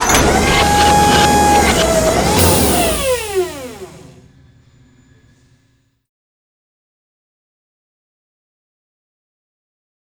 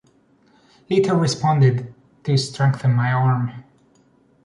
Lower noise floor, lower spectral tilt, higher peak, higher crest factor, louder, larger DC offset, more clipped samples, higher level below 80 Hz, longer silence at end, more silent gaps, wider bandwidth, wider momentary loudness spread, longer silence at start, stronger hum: about the same, -59 dBFS vs -57 dBFS; second, -3.5 dB/octave vs -6.5 dB/octave; first, 0 dBFS vs -6 dBFS; about the same, 16 dB vs 14 dB; first, -12 LUFS vs -19 LUFS; neither; neither; first, -28 dBFS vs -58 dBFS; first, 6.1 s vs 0.85 s; neither; first, over 20 kHz vs 11 kHz; about the same, 11 LU vs 11 LU; second, 0 s vs 0.9 s; neither